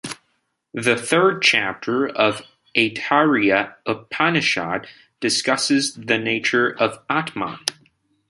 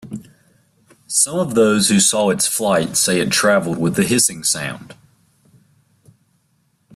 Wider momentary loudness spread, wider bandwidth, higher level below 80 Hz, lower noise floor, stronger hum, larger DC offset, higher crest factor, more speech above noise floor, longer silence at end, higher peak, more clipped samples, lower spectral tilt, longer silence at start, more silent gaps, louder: first, 11 LU vs 8 LU; about the same, 16 kHz vs 15.5 kHz; second, -62 dBFS vs -56 dBFS; first, -70 dBFS vs -63 dBFS; neither; neither; about the same, 22 dB vs 18 dB; first, 50 dB vs 46 dB; second, 0.6 s vs 2 s; about the same, 0 dBFS vs -2 dBFS; neither; about the same, -3.5 dB/octave vs -3 dB/octave; about the same, 0.05 s vs 0.05 s; neither; second, -20 LUFS vs -16 LUFS